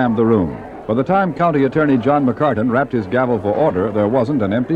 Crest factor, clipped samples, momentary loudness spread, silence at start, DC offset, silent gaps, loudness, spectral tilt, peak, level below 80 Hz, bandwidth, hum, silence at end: 14 dB; under 0.1%; 4 LU; 0 s; under 0.1%; none; -16 LUFS; -9.5 dB/octave; -2 dBFS; -46 dBFS; 7 kHz; none; 0 s